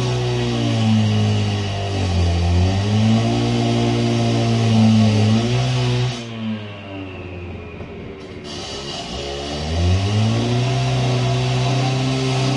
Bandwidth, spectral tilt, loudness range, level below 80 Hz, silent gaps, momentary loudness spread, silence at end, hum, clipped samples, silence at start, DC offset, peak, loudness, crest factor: 11 kHz; -6 dB/octave; 10 LU; -38 dBFS; none; 15 LU; 0 s; none; under 0.1%; 0 s; under 0.1%; -4 dBFS; -19 LUFS; 14 dB